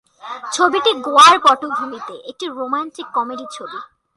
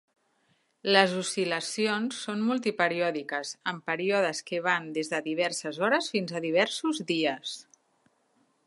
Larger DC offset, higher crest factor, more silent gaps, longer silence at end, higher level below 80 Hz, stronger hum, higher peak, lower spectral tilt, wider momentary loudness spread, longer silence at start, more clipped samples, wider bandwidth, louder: neither; second, 18 dB vs 26 dB; neither; second, 0.3 s vs 1.05 s; first, -66 dBFS vs -82 dBFS; neither; first, 0 dBFS vs -4 dBFS; second, -1 dB/octave vs -3.5 dB/octave; first, 22 LU vs 8 LU; second, 0.25 s vs 0.85 s; neither; about the same, 11.5 kHz vs 11.5 kHz; first, -14 LUFS vs -28 LUFS